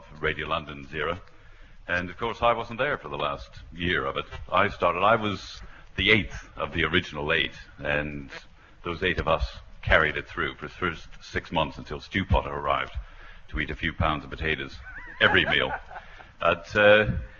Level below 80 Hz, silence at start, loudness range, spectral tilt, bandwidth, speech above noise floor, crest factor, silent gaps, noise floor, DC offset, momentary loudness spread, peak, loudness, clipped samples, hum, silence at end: -40 dBFS; 0 s; 5 LU; -5.5 dB/octave; 7.2 kHz; 21 dB; 24 dB; none; -47 dBFS; under 0.1%; 17 LU; -4 dBFS; -26 LUFS; under 0.1%; none; 0.05 s